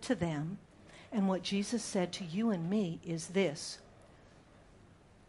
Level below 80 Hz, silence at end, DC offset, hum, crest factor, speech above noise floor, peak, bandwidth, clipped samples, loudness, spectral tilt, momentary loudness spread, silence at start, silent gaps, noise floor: -66 dBFS; 0.65 s; under 0.1%; none; 18 dB; 26 dB; -18 dBFS; 11.5 kHz; under 0.1%; -35 LUFS; -5.5 dB/octave; 12 LU; 0 s; none; -60 dBFS